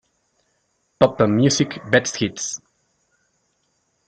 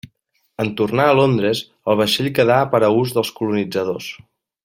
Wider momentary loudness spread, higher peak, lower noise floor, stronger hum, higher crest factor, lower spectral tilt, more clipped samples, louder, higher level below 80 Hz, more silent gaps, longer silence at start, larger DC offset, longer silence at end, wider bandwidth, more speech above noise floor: about the same, 11 LU vs 10 LU; about the same, 0 dBFS vs -2 dBFS; first, -69 dBFS vs -63 dBFS; neither; first, 22 dB vs 16 dB; about the same, -4.5 dB/octave vs -5.5 dB/octave; neither; about the same, -19 LUFS vs -18 LUFS; about the same, -56 dBFS vs -56 dBFS; neither; first, 1 s vs 0.6 s; neither; first, 1.5 s vs 0.5 s; second, 9.6 kHz vs 16.5 kHz; first, 50 dB vs 46 dB